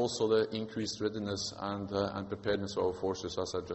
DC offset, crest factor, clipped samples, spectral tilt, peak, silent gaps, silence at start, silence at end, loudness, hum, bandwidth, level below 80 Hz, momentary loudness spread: under 0.1%; 18 dB; under 0.1%; -4.5 dB/octave; -16 dBFS; none; 0 s; 0 s; -34 LUFS; none; 8.2 kHz; -62 dBFS; 7 LU